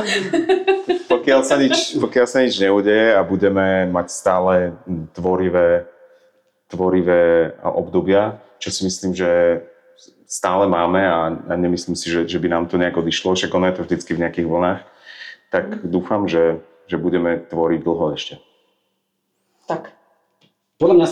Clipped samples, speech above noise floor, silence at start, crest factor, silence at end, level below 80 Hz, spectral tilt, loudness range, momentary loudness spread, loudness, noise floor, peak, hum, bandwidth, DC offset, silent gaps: under 0.1%; 54 dB; 0 s; 16 dB; 0 s; -52 dBFS; -5 dB/octave; 6 LU; 11 LU; -18 LUFS; -71 dBFS; -2 dBFS; none; 12 kHz; under 0.1%; none